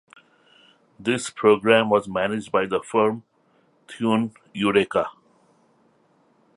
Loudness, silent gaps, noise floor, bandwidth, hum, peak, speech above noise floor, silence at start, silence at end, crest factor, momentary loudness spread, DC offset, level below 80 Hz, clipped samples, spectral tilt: -22 LUFS; none; -62 dBFS; 11.5 kHz; none; -2 dBFS; 41 dB; 1 s; 1.45 s; 22 dB; 12 LU; under 0.1%; -62 dBFS; under 0.1%; -5 dB/octave